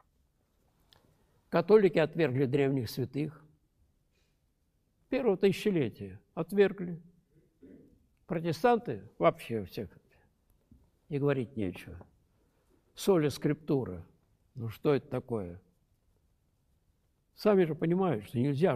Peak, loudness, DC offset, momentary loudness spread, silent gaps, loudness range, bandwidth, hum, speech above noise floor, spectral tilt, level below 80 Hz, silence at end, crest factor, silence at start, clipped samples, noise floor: -12 dBFS; -30 LUFS; under 0.1%; 15 LU; none; 7 LU; 15 kHz; none; 45 dB; -7 dB/octave; -66 dBFS; 0 s; 20 dB; 1.5 s; under 0.1%; -74 dBFS